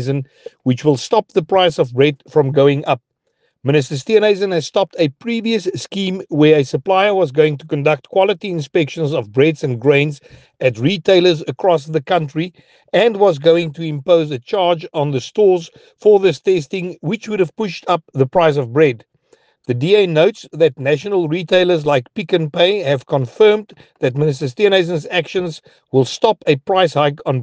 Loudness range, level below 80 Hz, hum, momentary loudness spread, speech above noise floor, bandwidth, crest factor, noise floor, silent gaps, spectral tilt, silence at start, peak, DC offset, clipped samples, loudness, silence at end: 1 LU; -60 dBFS; none; 9 LU; 50 dB; 9.2 kHz; 16 dB; -66 dBFS; none; -6 dB/octave; 0 s; 0 dBFS; under 0.1%; under 0.1%; -16 LUFS; 0 s